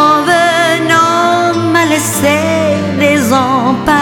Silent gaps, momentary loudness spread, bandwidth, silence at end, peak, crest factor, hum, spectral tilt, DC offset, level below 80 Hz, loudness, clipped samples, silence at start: none; 3 LU; 19 kHz; 0 s; 0 dBFS; 10 dB; none; -4 dB/octave; under 0.1%; -42 dBFS; -10 LUFS; 0.4%; 0 s